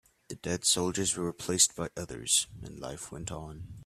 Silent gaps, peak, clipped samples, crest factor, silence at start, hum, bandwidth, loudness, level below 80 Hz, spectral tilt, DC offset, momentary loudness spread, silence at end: none; -10 dBFS; under 0.1%; 24 dB; 0.3 s; none; 15.5 kHz; -29 LUFS; -56 dBFS; -2.5 dB/octave; under 0.1%; 17 LU; 0 s